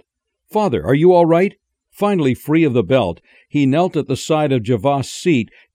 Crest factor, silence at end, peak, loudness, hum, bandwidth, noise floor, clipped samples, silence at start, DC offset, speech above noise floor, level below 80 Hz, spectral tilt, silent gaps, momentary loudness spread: 14 dB; 0.3 s; -2 dBFS; -16 LUFS; none; 16 kHz; -65 dBFS; under 0.1%; 0.55 s; under 0.1%; 50 dB; -50 dBFS; -7 dB/octave; none; 9 LU